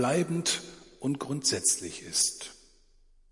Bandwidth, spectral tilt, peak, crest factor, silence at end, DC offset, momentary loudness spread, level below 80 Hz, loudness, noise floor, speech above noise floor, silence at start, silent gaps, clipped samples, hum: 11.5 kHz; -2.5 dB/octave; -12 dBFS; 18 dB; 0.75 s; under 0.1%; 14 LU; -64 dBFS; -28 LUFS; -60 dBFS; 31 dB; 0 s; none; under 0.1%; none